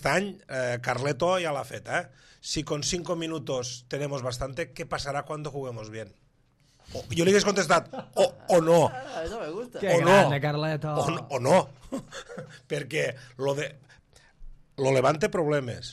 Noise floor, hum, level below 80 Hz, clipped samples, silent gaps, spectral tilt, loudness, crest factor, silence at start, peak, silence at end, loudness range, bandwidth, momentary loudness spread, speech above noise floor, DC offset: -64 dBFS; none; -54 dBFS; under 0.1%; none; -4.5 dB/octave; -27 LUFS; 20 dB; 0 s; -6 dBFS; 0 s; 9 LU; 14 kHz; 16 LU; 37 dB; under 0.1%